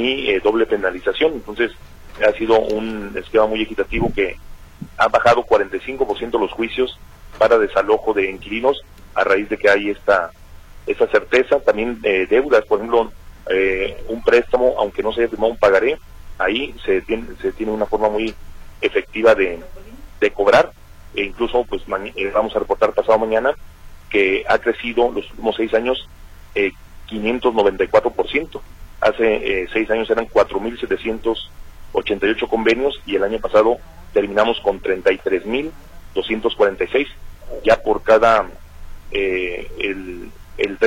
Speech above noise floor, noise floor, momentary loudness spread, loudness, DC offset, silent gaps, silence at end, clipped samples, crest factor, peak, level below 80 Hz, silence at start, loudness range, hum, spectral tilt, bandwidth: 21 dB; -38 dBFS; 10 LU; -18 LUFS; under 0.1%; none; 0 s; under 0.1%; 16 dB; -2 dBFS; -38 dBFS; 0 s; 2 LU; none; -5 dB/octave; 16 kHz